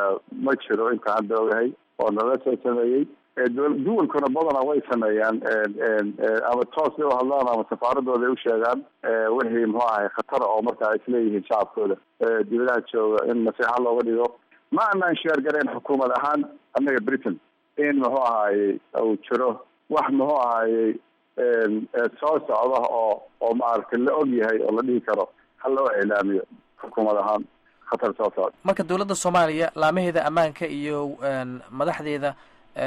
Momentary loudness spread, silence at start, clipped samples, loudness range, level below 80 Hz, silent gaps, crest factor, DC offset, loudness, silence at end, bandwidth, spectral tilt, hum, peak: 6 LU; 0 s; under 0.1%; 1 LU; -68 dBFS; none; 12 dB; under 0.1%; -23 LUFS; 0 s; 12 kHz; -5.5 dB/octave; none; -10 dBFS